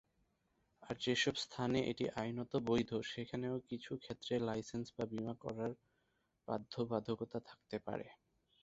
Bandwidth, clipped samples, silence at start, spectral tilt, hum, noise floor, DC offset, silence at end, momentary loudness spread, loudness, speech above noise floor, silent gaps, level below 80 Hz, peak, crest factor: 8 kHz; under 0.1%; 0.8 s; -4.5 dB/octave; none; -81 dBFS; under 0.1%; 0.45 s; 10 LU; -41 LUFS; 41 dB; none; -70 dBFS; -22 dBFS; 20 dB